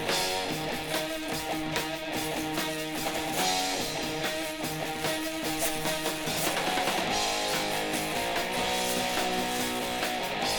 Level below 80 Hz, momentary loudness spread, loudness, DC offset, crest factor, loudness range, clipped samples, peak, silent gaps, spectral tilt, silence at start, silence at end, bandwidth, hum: -52 dBFS; 4 LU; -29 LUFS; under 0.1%; 20 dB; 2 LU; under 0.1%; -10 dBFS; none; -2.5 dB/octave; 0 s; 0 s; over 20 kHz; none